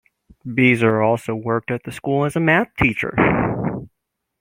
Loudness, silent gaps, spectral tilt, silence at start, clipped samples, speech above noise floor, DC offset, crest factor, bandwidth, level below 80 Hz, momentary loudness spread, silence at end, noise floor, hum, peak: -19 LUFS; none; -7 dB/octave; 0.45 s; under 0.1%; 58 dB; under 0.1%; 18 dB; 16 kHz; -44 dBFS; 10 LU; 0.55 s; -77 dBFS; none; -2 dBFS